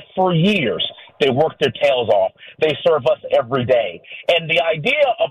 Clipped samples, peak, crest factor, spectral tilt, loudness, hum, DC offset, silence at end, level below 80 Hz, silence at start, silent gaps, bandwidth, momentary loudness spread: under 0.1%; -6 dBFS; 12 dB; -6 dB/octave; -17 LUFS; none; under 0.1%; 0 s; -56 dBFS; 0 s; none; 12 kHz; 6 LU